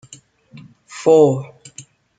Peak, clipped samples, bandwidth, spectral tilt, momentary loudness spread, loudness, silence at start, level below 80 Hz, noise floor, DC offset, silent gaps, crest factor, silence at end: 0 dBFS; under 0.1%; 9.2 kHz; -6.5 dB/octave; 26 LU; -15 LUFS; 0.95 s; -66 dBFS; -46 dBFS; under 0.1%; none; 18 dB; 0.35 s